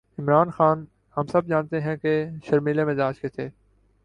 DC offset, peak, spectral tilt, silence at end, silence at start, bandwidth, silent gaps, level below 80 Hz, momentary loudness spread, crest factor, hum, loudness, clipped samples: under 0.1%; -6 dBFS; -9 dB/octave; 0.55 s; 0.2 s; 9.8 kHz; none; -60 dBFS; 11 LU; 18 dB; none; -24 LUFS; under 0.1%